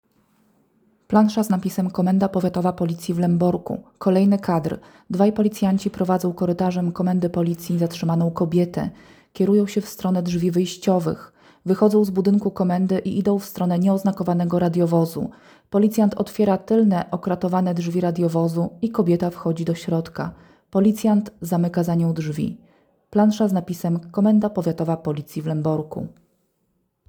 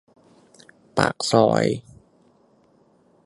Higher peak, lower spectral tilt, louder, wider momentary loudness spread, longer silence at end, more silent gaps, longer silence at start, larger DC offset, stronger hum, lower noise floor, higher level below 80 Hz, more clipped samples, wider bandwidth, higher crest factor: second, -4 dBFS vs 0 dBFS; first, -8 dB/octave vs -5 dB/octave; about the same, -21 LUFS vs -21 LUFS; second, 8 LU vs 11 LU; second, 1 s vs 1.45 s; neither; first, 1.1 s vs 0.95 s; neither; neither; first, -70 dBFS vs -59 dBFS; about the same, -56 dBFS vs -58 dBFS; neither; first, over 20 kHz vs 11.5 kHz; second, 16 dB vs 24 dB